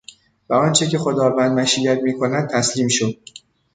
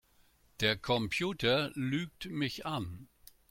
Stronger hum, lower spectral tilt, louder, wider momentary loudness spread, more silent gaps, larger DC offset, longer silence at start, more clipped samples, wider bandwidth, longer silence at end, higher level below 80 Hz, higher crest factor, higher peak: neither; about the same, -4 dB/octave vs -5 dB/octave; first, -18 LUFS vs -33 LUFS; second, 5 LU vs 10 LU; neither; neither; about the same, 0.5 s vs 0.6 s; neither; second, 9.6 kHz vs 16.5 kHz; first, 0.6 s vs 0.45 s; about the same, -58 dBFS vs -60 dBFS; about the same, 16 dB vs 20 dB; first, -2 dBFS vs -14 dBFS